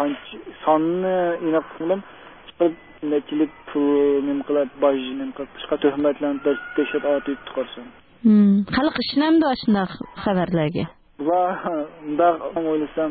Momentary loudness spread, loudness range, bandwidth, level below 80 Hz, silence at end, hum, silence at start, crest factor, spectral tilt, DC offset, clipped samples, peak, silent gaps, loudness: 11 LU; 3 LU; 4.8 kHz; -54 dBFS; 0 s; none; 0 s; 16 dB; -11.5 dB/octave; 0.1%; under 0.1%; -6 dBFS; none; -22 LUFS